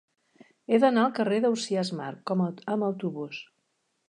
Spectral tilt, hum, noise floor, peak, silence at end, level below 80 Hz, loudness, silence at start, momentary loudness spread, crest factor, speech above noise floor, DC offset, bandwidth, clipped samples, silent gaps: -6 dB/octave; none; -76 dBFS; -10 dBFS; 0.65 s; -80 dBFS; -27 LUFS; 0.7 s; 14 LU; 18 dB; 49 dB; under 0.1%; 11 kHz; under 0.1%; none